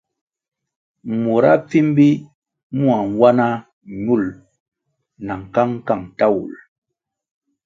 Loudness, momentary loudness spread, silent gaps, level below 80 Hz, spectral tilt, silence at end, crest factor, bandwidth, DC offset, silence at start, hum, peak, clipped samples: -17 LUFS; 15 LU; 2.35-2.42 s, 2.63-2.70 s, 3.73-3.81 s, 4.60-4.72 s; -56 dBFS; -8.5 dB/octave; 1.1 s; 18 dB; 7.4 kHz; under 0.1%; 1.05 s; none; 0 dBFS; under 0.1%